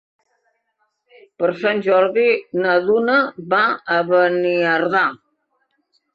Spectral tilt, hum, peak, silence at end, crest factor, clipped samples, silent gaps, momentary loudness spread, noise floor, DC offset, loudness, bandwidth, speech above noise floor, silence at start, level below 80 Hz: -7 dB/octave; none; -4 dBFS; 1 s; 16 dB; under 0.1%; none; 4 LU; -69 dBFS; under 0.1%; -17 LUFS; 6.6 kHz; 53 dB; 1.4 s; -70 dBFS